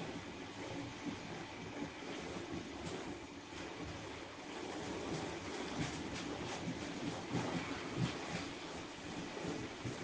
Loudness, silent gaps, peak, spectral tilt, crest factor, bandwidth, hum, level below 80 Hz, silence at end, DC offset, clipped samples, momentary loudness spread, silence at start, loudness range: -44 LUFS; none; -26 dBFS; -4.5 dB/octave; 18 dB; 10 kHz; none; -64 dBFS; 0 s; under 0.1%; under 0.1%; 7 LU; 0 s; 4 LU